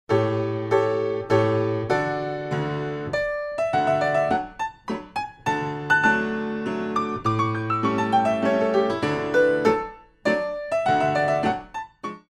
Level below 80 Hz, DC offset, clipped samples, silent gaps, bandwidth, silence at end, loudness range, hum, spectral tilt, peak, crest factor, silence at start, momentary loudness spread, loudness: -54 dBFS; under 0.1%; under 0.1%; none; 12.5 kHz; 0.1 s; 3 LU; none; -6.5 dB/octave; -6 dBFS; 18 dB; 0.1 s; 8 LU; -23 LUFS